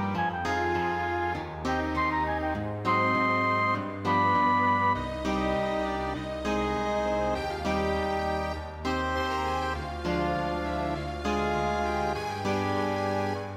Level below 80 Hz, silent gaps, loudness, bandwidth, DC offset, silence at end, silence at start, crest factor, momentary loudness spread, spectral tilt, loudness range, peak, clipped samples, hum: -42 dBFS; none; -28 LUFS; 16 kHz; under 0.1%; 0 s; 0 s; 14 dB; 7 LU; -6 dB/octave; 4 LU; -14 dBFS; under 0.1%; none